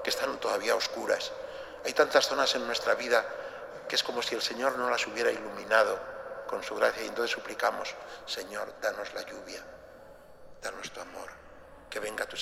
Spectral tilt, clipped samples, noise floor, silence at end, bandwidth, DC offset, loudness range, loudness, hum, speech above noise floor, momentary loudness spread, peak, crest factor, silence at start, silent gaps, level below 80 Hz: -1.5 dB/octave; under 0.1%; -51 dBFS; 0 s; 16 kHz; under 0.1%; 11 LU; -30 LUFS; none; 20 dB; 16 LU; -8 dBFS; 24 dB; 0 s; none; -64 dBFS